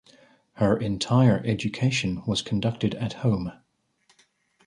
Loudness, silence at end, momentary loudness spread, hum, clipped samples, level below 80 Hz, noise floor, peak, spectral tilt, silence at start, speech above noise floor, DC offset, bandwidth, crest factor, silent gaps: -25 LUFS; 1.15 s; 8 LU; none; under 0.1%; -52 dBFS; -66 dBFS; -8 dBFS; -6 dB/octave; 0.55 s; 42 dB; under 0.1%; 10.5 kHz; 18 dB; none